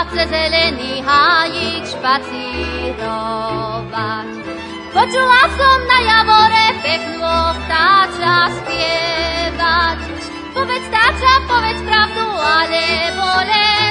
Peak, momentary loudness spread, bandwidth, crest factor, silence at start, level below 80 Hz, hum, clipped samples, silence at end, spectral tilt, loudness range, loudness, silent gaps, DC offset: 0 dBFS; 12 LU; 11 kHz; 14 dB; 0 s; -34 dBFS; none; under 0.1%; 0 s; -3.5 dB/octave; 6 LU; -14 LUFS; none; under 0.1%